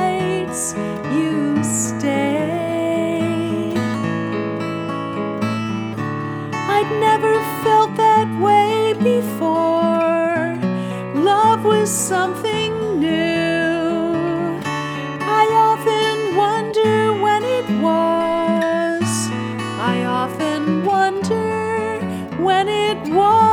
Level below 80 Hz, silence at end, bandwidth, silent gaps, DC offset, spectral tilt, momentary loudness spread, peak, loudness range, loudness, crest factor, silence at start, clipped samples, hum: -56 dBFS; 0 s; over 20 kHz; none; under 0.1%; -5 dB/octave; 9 LU; -2 dBFS; 5 LU; -18 LUFS; 14 dB; 0 s; under 0.1%; none